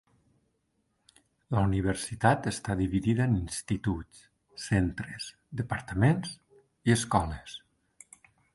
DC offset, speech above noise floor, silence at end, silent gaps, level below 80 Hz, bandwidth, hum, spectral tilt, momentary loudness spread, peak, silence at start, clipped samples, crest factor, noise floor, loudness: under 0.1%; 47 dB; 0.95 s; none; -46 dBFS; 12 kHz; none; -6 dB/octave; 16 LU; -8 dBFS; 1.5 s; under 0.1%; 24 dB; -76 dBFS; -29 LUFS